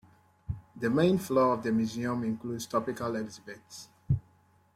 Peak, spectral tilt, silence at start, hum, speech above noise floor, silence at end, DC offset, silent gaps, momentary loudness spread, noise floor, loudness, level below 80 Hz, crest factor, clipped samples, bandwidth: -12 dBFS; -6.5 dB/octave; 0.5 s; none; 35 dB; 0.55 s; under 0.1%; none; 19 LU; -64 dBFS; -30 LUFS; -54 dBFS; 18 dB; under 0.1%; 15.5 kHz